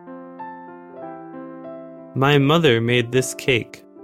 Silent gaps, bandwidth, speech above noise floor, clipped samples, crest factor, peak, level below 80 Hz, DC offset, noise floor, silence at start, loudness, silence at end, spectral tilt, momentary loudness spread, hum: none; 16 kHz; 20 dB; under 0.1%; 18 dB; -4 dBFS; -56 dBFS; under 0.1%; -38 dBFS; 0.05 s; -18 LUFS; 0.25 s; -5 dB/octave; 22 LU; none